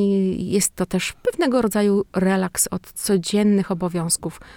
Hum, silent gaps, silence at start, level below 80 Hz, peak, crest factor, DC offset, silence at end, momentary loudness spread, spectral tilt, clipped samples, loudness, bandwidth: none; none; 0 s; -48 dBFS; -6 dBFS; 14 dB; under 0.1%; 0 s; 5 LU; -4.5 dB/octave; under 0.1%; -21 LUFS; 18.5 kHz